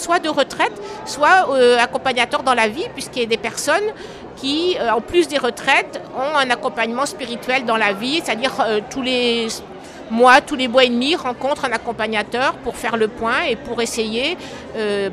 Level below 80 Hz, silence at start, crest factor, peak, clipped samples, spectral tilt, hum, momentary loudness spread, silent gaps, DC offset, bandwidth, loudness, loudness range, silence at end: -50 dBFS; 0 s; 18 dB; 0 dBFS; under 0.1%; -3 dB/octave; none; 12 LU; none; under 0.1%; 15 kHz; -18 LUFS; 3 LU; 0 s